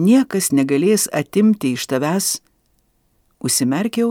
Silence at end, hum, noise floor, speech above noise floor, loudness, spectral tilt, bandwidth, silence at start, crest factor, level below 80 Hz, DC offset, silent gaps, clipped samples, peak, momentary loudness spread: 0 s; none; -62 dBFS; 46 dB; -18 LUFS; -4.5 dB/octave; 19 kHz; 0 s; 14 dB; -62 dBFS; under 0.1%; none; under 0.1%; -4 dBFS; 5 LU